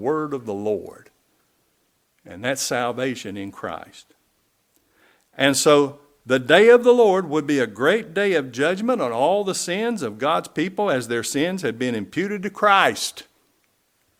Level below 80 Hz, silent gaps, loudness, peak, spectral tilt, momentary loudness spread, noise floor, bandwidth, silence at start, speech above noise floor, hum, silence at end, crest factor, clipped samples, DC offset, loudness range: -66 dBFS; none; -20 LUFS; 0 dBFS; -4 dB/octave; 13 LU; -67 dBFS; 16.5 kHz; 0 s; 47 dB; none; 1 s; 22 dB; under 0.1%; under 0.1%; 11 LU